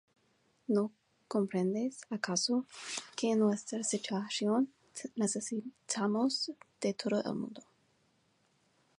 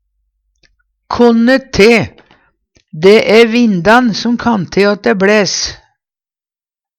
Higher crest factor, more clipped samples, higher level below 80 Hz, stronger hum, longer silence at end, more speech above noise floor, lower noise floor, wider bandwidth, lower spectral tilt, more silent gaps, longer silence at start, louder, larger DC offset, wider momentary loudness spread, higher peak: first, 18 dB vs 12 dB; second, under 0.1% vs 0.1%; second, -82 dBFS vs -42 dBFS; neither; first, 1.4 s vs 1.25 s; second, 39 dB vs over 81 dB; second, -73 dBFS vs under -90 dBFS; about the same, 11.5 kHz vs 12 kHz; about the same, -4 dB/octave vs -4.5 dB/octave; neither; second, 0.7 s vs 1.1 s; second, -34 LUFS vs -10 LUFS; neither; about the same, 9 LU vs 7 LU; second, -16 dBFS vs 0 dBFS